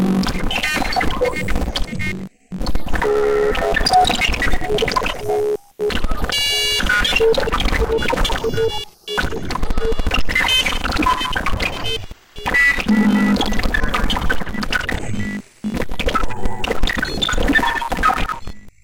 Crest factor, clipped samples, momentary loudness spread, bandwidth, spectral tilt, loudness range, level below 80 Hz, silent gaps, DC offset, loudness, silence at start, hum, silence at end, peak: 14 dB; under 0.1%; 11 LU; 17 kHz; -4 dB/octave; 3 LU; -24 dBFS; none; under 0.1%; -19 LUFS; 0 s; none; 0.05 s; -2 dBFS